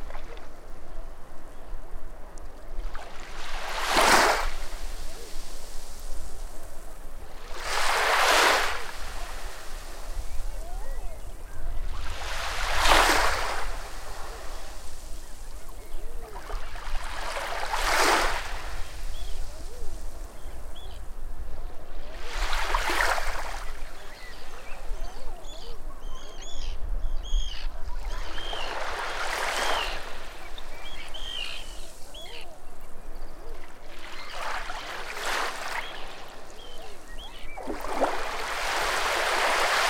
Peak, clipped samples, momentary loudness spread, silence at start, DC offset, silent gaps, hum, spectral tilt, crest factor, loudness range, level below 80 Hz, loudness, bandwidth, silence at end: -6 dBFS; under 0.1%; 22 LU; 0 s; under 0.1%; none; none; -2 dB/octave; 20 dB; 15 LU; -34 dBFS; -28 LUFS; 16 kHz; 0 s